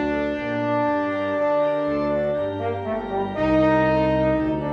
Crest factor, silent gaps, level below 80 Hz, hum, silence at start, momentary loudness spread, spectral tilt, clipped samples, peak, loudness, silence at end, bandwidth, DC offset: 14 dB; none; -42 dBFS; none; 0 s; 7 LU; -8.5 dB/octave; under 0.1%; -8 dBFS; -22 LUFS; 0 s; 6.8 kHz; under 0.1%